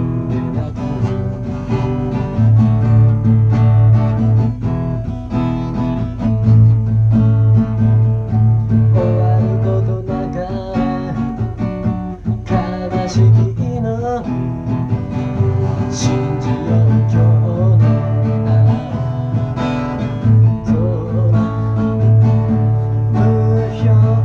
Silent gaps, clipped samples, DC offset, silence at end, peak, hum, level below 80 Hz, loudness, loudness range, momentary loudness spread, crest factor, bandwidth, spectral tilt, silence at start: none; under 0.1%; under 0.1%; 0 s; -2 dBFS; none; -32 dBFS; -15 LUFS; 4 LU; 9 LU; 12 dB; 6.8 kHz; -9 dB/octave; 0 s